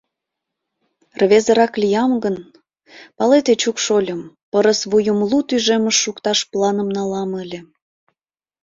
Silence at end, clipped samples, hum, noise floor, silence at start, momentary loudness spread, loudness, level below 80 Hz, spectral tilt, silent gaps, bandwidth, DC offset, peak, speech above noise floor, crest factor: 1 s; under 0.1%; none; -82 dBFS; 1.2 s; 11 LU; -17 LUFS; -60 dBFS; -3.5 dB/octave; 4.43-4.52 s; 7.8 kHz; under 0.1%; -2 dBFS; 65 dB; 16 dB